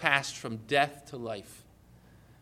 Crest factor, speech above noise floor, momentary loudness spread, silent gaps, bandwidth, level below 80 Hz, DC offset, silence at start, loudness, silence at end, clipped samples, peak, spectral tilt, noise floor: 26 dB; 26 dB; 14 LU; none; 16 kHz; -64 dBFS; under 0.1%; 0 s; -31 LUFS; 0.8 s; under 0.1%; -6 dBFS; -3.5 dB/octave; -57 dBFS